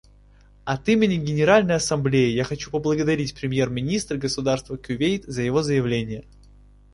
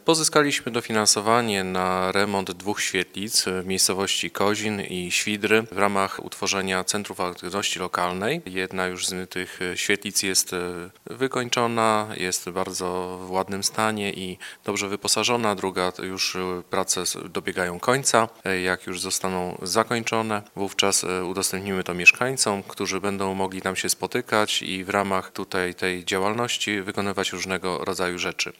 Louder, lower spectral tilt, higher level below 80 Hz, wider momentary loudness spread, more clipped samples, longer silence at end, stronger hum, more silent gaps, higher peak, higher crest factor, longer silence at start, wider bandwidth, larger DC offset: about the same, -22 LUFS vs -24 LUFS; first, -5.5 dB/octave vs -2.5 dB/octave; first, -48 dBFS vs -64 dBFS; about the same, 9 LU vs 8 LU; neither; first, 0.7 s vs 0.1 s; first, 50 Hz at -45 dBFS vs none; neither; second, -4 dBFS vs 0 dBFS; second, 18 dB vs 24 dB; first, 0.65 s vs 0.05 s; second, 11.5 kHz vs 17.5 kHz; neither